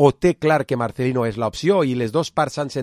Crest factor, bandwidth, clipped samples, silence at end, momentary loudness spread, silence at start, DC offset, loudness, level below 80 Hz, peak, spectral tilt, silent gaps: 18 dB; 14.5 kHz; under 0.1%; 0 s; 5 LU; 0 s; under 0.1%; -20 LUFS; -50 dBFS; -2 dBFS; -6.5 dB/octave; none